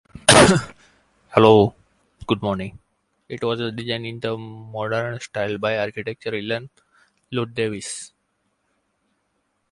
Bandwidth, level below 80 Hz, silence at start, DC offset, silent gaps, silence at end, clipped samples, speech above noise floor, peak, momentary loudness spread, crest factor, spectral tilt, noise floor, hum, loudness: 11.5 kHz; -48 dBFS; 0.15 s; under 0.1%; none; 1.65 s; under 0.1%; 49 dB; 0 dBFS; 19 LU; 22 dB; -4 dB/octave; -71 dBFS; none; -20 LUFS